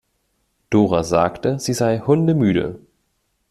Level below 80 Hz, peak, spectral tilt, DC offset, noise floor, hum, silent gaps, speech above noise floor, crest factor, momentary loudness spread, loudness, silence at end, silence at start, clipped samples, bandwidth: -50 dBFS; -2 dBFS; -6.5 dB/octave; under 0.1%; -69 dBFS; none; none; 51 dB; 18 dB; 6 LU; -18 LUFS; 0.75 s; 0.7 s; under 0.1%; 13.5 kHz